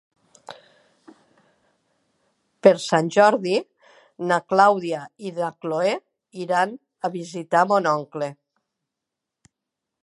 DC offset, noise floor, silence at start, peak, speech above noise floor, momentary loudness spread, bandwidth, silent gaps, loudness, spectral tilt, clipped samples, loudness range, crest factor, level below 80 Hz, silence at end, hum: under 0.1%; -84 dBFS; 0.5 s; 0 dBFS; 64 dB; 15 LU; 11.5 kHz; none; -22 LUFS; -5 dB/octave; under 0.1%; 5 LU; 24 dB; -78 dBFS; 1.7 s; none